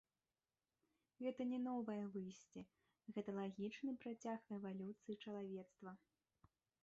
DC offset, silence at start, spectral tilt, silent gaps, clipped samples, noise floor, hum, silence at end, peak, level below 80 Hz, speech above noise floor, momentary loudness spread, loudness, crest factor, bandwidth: under 0.1%; 1.2 s; -6.5 dB/octave; none; under 0.1%; under -90 dBFS; none; 0.85 s; -34 dBFS; -88 dBFS; over 41 dB; 15 LU; -49 LUFS; 16 dB; 7.6 kHz